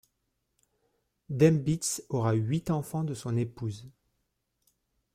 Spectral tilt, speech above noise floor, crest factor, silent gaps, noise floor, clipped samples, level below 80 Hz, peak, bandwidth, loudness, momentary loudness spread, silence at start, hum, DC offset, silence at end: -6.5 dB/octave; 51 dB; 20 dB; none; -79 dBFS; under 0.1%; -62 dBFS; -10 dBFS; 15.5 kHz; -29 LUFS; 14 LU; 1.3 s; none; under 0.1%; 1.25 s